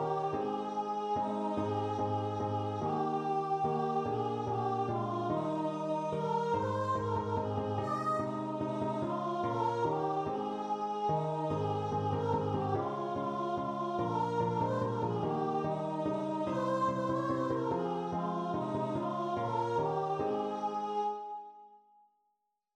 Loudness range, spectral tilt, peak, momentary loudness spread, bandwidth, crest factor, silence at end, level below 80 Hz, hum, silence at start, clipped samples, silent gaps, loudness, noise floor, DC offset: 1 LU; -8 dB/octave; -20 dBFS; 3 LU; 10.5 kHz; 14 dB; 1 s; -66 dBFS; none; 0 s; under 0.1%; none; -34 LUFS; -81 dBFS; under 0.1%